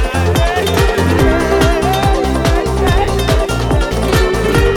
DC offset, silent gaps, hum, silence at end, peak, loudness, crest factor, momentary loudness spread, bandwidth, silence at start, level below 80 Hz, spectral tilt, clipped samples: under 0.1%; none; none; 0 s; -2 dBFS; -13 LUFS; 10 dB; 3 LU; 18 kHz; 0 s; -18 dBFS; -5.5 dB/octave; under 0.1%